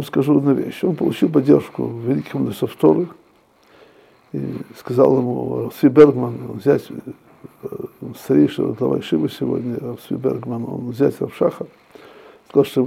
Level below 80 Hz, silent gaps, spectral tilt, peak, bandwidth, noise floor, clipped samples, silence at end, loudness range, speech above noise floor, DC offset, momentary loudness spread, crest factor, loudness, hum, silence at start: -58 dBFS; none; -8 dB/octave; 0 dBFS; 15.5 kHz; -54 dBFS; under 0.1%; 0 s; 5 LU; 36 dB; under 0.1%; 17 LU; 18 dB; -19 LUFS; none; 0 s